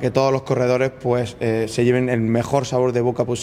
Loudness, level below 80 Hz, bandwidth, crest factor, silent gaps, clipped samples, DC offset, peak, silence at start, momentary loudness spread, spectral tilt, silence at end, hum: -20 LUFS; -50 dBFS; 15 kHz; 18 dB; none; under 0.1%; under 0.1%; -2 dBFS; 0 s; 4 LU; -6.5 dB/octave; 0 s; none